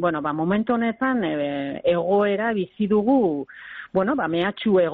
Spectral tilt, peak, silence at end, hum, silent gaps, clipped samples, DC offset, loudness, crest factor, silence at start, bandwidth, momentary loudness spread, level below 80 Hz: -5 dB/octave; -10 dBFS; 0 s; none; none; under 0.1%; under 0.1%; -22 LUFS; 12 dB; 0 s; 4.5 kHz; 6 LU; -58 dBFS